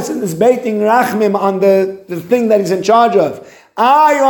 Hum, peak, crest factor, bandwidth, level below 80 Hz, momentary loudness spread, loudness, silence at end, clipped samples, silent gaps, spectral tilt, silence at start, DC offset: none; 0 dBFS; 12 dB; 17.5 kHz; -60 dBFS; 10 LU; -12 LUFS; 0 s; under 0.1%; none; -5.5 dB/octave; 0 s; under 0.1%